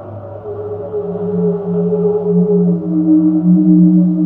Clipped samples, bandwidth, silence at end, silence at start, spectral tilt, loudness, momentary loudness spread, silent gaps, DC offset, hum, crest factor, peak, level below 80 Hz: under 0.1%; 1.6 kHz; 0 s; 0 s; -14.5 dB/octave; -13 LUFS; 15 LU; none; under 0.1%; none; 12 dB; 0 dBFS; -50 dBFS